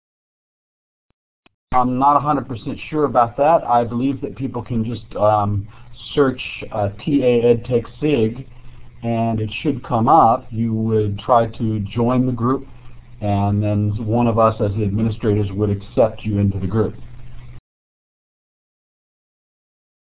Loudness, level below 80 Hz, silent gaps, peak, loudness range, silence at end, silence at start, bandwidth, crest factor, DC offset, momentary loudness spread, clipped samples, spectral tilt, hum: -19 LUFS; -40 dBFS; none; -2 dBFS; 4 LU; 2.55 s; 1.7 s; 4 kHz; 18 dB; under 0.1%; 10 LU; under 0.1%; -12 dB/octave; none